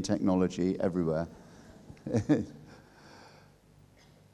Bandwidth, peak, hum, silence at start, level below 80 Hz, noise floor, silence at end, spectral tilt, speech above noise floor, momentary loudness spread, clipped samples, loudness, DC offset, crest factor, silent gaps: 11.5 kHz; -14 dBFS; 50 Hz at -60 dBFS; 0 s; -60 dBFS; -60 dBFS; 1.05 s; -7 dB/octave; 30 dB; 25 LU; under 0.1%; -31 LUFS; under 0.1%; 20 dB; none